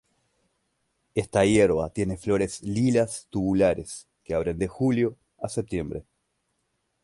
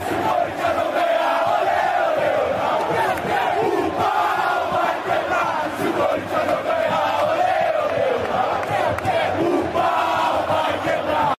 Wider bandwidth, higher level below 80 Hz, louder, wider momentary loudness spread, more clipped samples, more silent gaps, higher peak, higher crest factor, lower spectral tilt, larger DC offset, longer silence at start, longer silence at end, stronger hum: second, 11.5 kHz vs 15.5 kHz; about the same, -48 dBFS vs -52 dBFS; second, -25 LUFS vs -20 LUFS; first, 11 LU vs 2 LU; neither; neither; about the same, -8 dBFS vs -8 dBFS; first, 20 dB vs 12 dB; about the same, -6 dB/octave vs -5 dB/octave; neither; first, 1.15 s vs 0 s; first, 1.05 s vs 0.05 s; neither